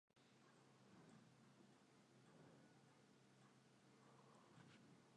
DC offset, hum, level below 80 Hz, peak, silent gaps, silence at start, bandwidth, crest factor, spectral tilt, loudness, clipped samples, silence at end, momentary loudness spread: under 0.1%; none; under -90 dBFS; -54 dBFS; none; 0.1 s; 10 kHz; 16 dB; -5 dB/octave; -69 LUFS; under 0.1%; 0 s; 1 LU